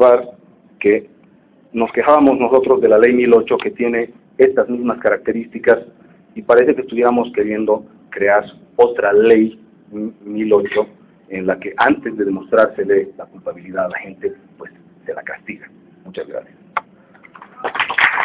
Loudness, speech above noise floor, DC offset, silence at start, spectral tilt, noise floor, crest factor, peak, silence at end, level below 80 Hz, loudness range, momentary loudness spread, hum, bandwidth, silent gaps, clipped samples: -16 LUFS; 34 dB; under 0.1%; 0 s; -9 dB/octave; -50 dBFS; 16 dB; 0 dBFS; 0 s; -56 dBFS; 14 LU; 18 LU; none; 4 kHz; none; under 0.1%